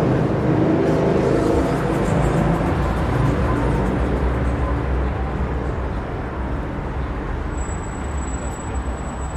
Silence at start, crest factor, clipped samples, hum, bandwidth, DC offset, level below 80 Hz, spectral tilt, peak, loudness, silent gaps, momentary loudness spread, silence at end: 0 s; 14 dB; under 0.1%; none; 11.5 kHz; under 0.1%; -26 dBFS; -7.5 dB/octave; -6 dBFS; -21 LUFS; none; 9 LU; 0 s